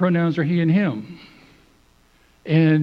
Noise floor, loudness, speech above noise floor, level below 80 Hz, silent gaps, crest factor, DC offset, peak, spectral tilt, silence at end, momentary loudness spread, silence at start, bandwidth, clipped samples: -56 dBFS; -20 LUFS; 38 dB; -60 dBFS; none; 16 dB; under 0.1%; -4 dBFS; -9.5 dB/octave; 0 s; 22 LU; 0 s; 5.4 kHz; under 0.1%